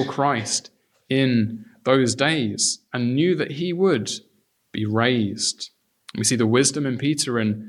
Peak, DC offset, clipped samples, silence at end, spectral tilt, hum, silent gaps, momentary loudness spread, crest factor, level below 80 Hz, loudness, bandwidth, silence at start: -4 dBFS; under 0.1%; under 0.1%; 0 s; -4 dB/octave; none; none; 10 LU; 18 dB; -66 dBFS; -21 LUFS; 13.5 kHz; 0 s